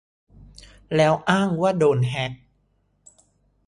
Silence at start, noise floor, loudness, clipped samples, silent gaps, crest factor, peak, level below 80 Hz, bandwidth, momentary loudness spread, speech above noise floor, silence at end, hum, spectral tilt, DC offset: 0.9 s; -66 dBFS; -21 LUFS; under 0.1%; none; 20 dB; -4 dBFS; -54 dBFS; 11.5 kHz; 8 LU; 46 dB; 1.3 s; none; -6.5 dB/octave; under 0.1%